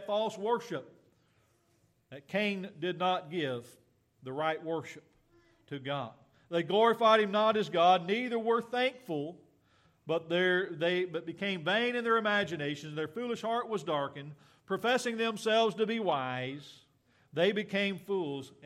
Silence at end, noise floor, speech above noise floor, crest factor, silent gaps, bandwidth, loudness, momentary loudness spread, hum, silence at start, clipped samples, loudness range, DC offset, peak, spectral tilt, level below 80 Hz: 0.15 s; -71 dBFS; 40 dB; 20 dB; none; 14.5 kHz; -31 LUFS; 15 LU; none; 0 s; under 0.1%; 8 LU; under 0.1%; -12 dBFS; -5 dB/octave; -80 dBFS